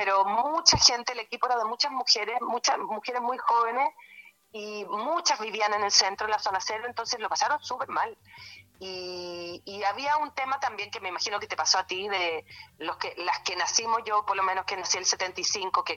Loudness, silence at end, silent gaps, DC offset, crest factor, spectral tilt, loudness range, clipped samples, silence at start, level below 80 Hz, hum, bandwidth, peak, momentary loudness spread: -26 LUFS; 0 s; none; under 0.1%; 26 dB; -0.5 dB/octave; 7 LU; under 0.1%; 0 s; -60 dBFS; none; 16.5 kHz; -2 dBFS; 15 LU